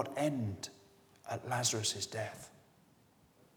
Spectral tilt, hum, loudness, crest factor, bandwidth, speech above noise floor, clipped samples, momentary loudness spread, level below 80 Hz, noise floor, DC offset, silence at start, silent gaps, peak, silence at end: -3.5 dB/octave; none; -37 LUFS; 22 dB; over 20 kHz; 30 dB; under 0.1%; 19 LU; -76 dBFS; -67 dBFS; under 0.1%; 0 s; none; -18 dBFS; 1 s